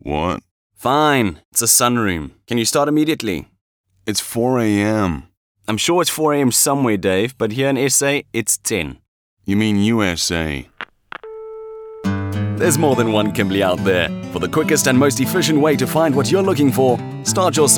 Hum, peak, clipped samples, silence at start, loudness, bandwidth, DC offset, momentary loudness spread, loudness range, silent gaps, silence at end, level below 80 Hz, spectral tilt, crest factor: none; -2 dBFS; under 0.1%; 0.05 s; -17 LUFS; over 20 kHz; under 0.1%; 14 LU; 5 LU; 0.51-0.70 s, 1.45-1.52 s, 3.61-3.84 s, 5.37-5.55 s, 9.08-9.37 s; 0 s; -44 dBFS; -4 dB/octave; 16 dB